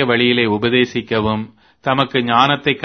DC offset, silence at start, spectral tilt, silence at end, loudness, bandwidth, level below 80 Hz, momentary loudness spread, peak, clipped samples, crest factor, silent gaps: under 0.1%; 0 s; -6 dB/octave; 0 s; -16 LUFS; 6.6 kHz; -48 dBFS; 9 LU; 0 dBFS; under 0.1%; 16 dB; none